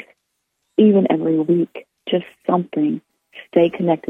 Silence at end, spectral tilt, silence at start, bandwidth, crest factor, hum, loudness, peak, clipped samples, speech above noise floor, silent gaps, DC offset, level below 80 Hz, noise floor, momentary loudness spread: 0.15 s; -9.5 dB/octave; 0.8 s; 3.8 kHz; 16 dB; none; -18 LUFS; -2 dBFS; under 0.1%; 56 dB; none; under 0.1%; -66 dBFS; -73 dBFS; 10 LU